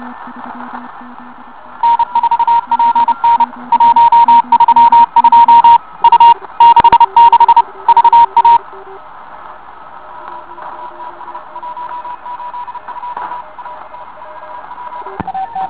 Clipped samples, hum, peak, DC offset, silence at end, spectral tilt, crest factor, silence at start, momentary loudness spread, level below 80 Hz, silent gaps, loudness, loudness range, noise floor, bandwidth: 2%; none; 0 dBFS; 1%; 0 s; -1 dB/octave; 10 dB; 0 s; 23 LU; -50 dBFS; none; -8 LUFS; 20 LU; -33 dBFS; 4 kHz